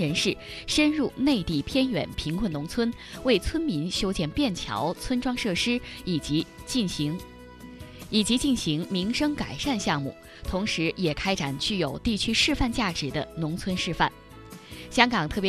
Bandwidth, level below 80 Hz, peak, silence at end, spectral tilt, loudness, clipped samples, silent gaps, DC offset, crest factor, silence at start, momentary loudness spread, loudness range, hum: 14 kHz; -42 dBFS; -4 dBFS; 0 s; -4.5 dB/octave; -26 LUFS; under 0.1%; none; under 0.1%; 24 dB; 0 s; 9 LU; 2 LU; none